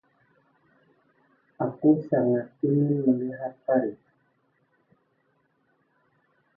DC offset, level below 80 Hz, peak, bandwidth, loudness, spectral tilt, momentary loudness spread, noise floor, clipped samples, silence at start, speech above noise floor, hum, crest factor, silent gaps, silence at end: under 0.1%; -74 dBFS; -10 dBFS; 2.1 kHz; -25 LUFS; -13.5 dB/octave; 10 LU; -70 dBFS; under 0.1%; 1.6 s; 46 dB; none; 20 dB; none; 2.6 s